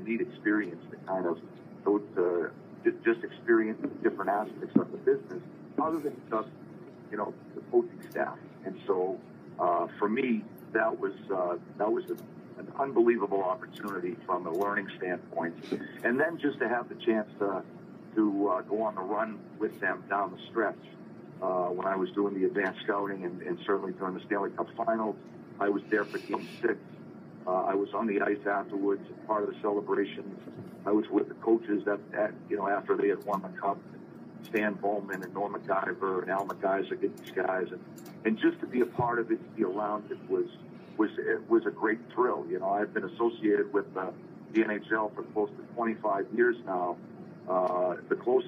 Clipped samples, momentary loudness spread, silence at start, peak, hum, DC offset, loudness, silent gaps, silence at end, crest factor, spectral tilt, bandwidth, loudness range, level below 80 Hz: under 0.1%; 12 LU; 0 s; -8 dBFS; none; under 0.1%; -31 LUFS; none; 0 s; 22 dB; -7.5 dB/octave; 15 kHz; 3 LU; -80 dBFS